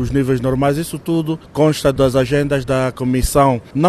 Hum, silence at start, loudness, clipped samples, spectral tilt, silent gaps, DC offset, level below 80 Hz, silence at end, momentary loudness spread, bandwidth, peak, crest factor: none; 0 s; -17 LUFS; under 0.1%; -6.5 dB/octave; none; under 0.1%; -30 dBFS; 0 s; 5 LU; 13.5 kHz; 0 dBFS; 16 dB